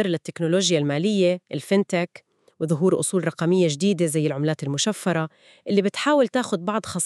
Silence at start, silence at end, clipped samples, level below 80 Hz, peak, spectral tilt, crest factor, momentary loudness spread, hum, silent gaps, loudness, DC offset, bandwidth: 0 s; 0 s; under 0.1%; -72 dBFS; -6 dBFS; -5 dB/octave; 18 dB; 7 LU; none; none; -22 LUFS; under 0.1%; 13.5 kHz